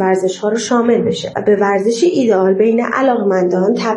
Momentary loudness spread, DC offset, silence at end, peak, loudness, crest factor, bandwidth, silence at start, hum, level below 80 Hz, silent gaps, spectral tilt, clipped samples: 4 LU; under 0.1%; 0 s; 0 dBFS; -14 LUFS; 12 dB; 11 kHz; 0 s; none; -60 dBFS; none; -5.5 dB/octave; under 0.1%